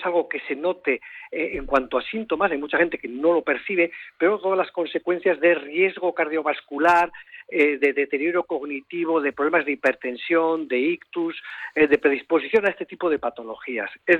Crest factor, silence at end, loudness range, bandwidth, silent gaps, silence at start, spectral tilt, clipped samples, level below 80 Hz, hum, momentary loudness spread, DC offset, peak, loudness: 16 dB; 0 s; 2 LU; 8.6 kHz; none; 0 s; -6 dB/octave; under 0.1%; -54 dBFS; none; 9 LU; under 0.1%; -6 dBFS; -23 LUFS